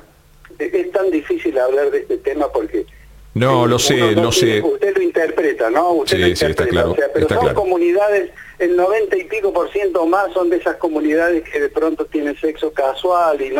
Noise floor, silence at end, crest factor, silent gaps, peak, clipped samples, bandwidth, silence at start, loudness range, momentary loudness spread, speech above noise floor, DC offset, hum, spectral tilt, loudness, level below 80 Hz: -45 dBFS; 0 s; 14 dB; none; -2 dBFS; under 0.1%; 17 kHz; 0.6 s; 3 LU; 7 LU; 29 dB; under 0.1%; none; -5 dB/octave; -16 LUFS; -42 dBFS